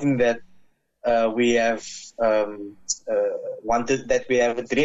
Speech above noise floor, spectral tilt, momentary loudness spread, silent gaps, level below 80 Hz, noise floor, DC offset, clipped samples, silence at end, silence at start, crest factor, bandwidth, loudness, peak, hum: 34 dB; -4 dB/octave; 10 LU; none; -52 dBFS; -56 dBFS; under 0.1%; under 0.1%; 0 s; 0 s; 14 dB; 8.2 kHz; -23 LUFS; -10 dBFS; none